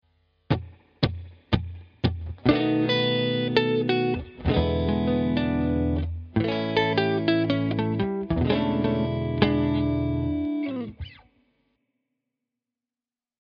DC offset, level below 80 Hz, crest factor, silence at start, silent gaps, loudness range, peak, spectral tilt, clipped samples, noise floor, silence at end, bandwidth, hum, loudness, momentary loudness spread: under 0.1%; -40 dBFS; 24 dB; 0.5 s; none; 4 LU; -2 dBFS; -5.5 dB/octave; under 0.1%; under -90 dBFS; 2.25 s; 6.6 kHz; none; -25 LUFS; 7 LU